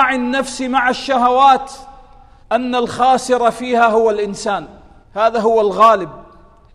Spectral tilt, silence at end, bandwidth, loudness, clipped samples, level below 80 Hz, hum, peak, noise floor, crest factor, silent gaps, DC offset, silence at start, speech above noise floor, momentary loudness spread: -4 dB/octave; 0.5 s; 12.5 kHz; -15 LUFS; under 0.1%; -46 dBFS; none; 0 dBFS; -44 dBFS; 16 dB; none; under 0.1%; 0 s; 30 dB; 10 LU